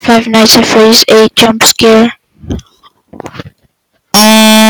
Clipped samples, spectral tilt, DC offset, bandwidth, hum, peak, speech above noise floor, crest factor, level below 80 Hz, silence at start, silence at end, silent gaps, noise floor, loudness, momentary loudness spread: 2%; -3 dB/octave; under 0.1%; over 20 kHz; none; 0 dBFS; 49 dB; 8 dB; -38 dBFS; 0.05 s; 0 s; none; -55 dBFS; -4 LUFS; 19 LU